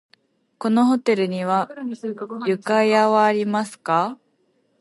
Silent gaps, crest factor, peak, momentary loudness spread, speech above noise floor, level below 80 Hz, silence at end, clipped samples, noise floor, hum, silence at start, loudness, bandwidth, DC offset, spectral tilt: none; 16 dB; -4 dBFS; 13 LU; 45 dB; -76 dBFS; 0.65 s; under 0.1%; -65 dBFS; none; 0.6 s; -21 LUFS; 11.5 kHz; under 0.1%; -6 dB/octave